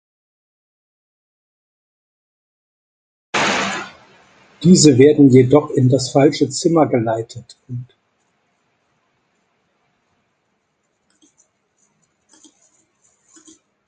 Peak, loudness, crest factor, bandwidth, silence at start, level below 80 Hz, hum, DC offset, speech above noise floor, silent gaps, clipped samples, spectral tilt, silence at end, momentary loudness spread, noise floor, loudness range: 0 dBFS; -14 LUFS; 18 dB; 9.6 kHz; 3.35 s; -56 dBFS; none; under 0.1%; 55 dB; none; under 0.1%; -5.5 dB/octave; 6.05 s; 22 LU; -68 dBFS; 13 LU